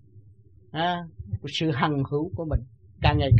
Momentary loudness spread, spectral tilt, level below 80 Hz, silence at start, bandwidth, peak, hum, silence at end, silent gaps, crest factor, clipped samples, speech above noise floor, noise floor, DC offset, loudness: 11 LU; -7 dB/octave; -38 dBFS; 0.15 s; 8.4 kHz; -6 dBFS; none; 0 s; none; 20 dB; under 0.1%; 30 dB; -54 dBFS; 0.1%; -27 LUFS